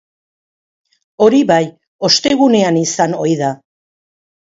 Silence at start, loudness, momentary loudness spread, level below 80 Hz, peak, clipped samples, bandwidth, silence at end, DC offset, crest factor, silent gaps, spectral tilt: 1.2 s; -13 LUFS; 10 LU; -58 dBFS; 0 dBFS; under 0.1%; 7.8 kHz; 0.85 s; under 0.1%; 16 dB; 1.87-1.99 s; -4.5 dB/octave